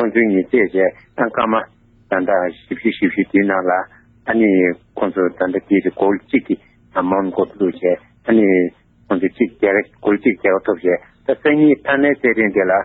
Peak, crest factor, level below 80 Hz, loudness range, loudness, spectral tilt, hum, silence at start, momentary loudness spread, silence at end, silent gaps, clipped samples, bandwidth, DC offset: -2 dBFS; 14 dB; -56 dBFS; 2 LU; -17 LUFS; -10 dB/octave; none; 0 s; 8 LU; 0 s; none; under 0.1%; 4.1 kHz; under 0.1%